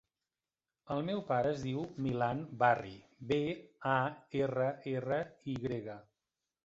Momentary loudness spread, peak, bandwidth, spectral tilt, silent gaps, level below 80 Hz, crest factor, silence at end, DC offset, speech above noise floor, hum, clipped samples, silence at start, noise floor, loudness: 10 LU; -14 dBFS; 7.8 kHz; -5.5 dB/octave; none; -68 dBFS; 22 dB; 0.65 s; under 0.1%; over 55 dB; none; under 0.1%; 0.85 s; under -90 dBFS; -35 LUFS